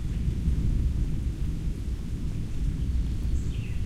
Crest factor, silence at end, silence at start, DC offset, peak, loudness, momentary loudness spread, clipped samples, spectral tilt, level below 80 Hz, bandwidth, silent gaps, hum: 14 dB; 0 s; 0 s; under 0.1%; -14 dBFS; -31 LUFS; 6 LU; under 0.1%; -7.5 dB/octave; -28 dBFS; 11.5 kHz; none; none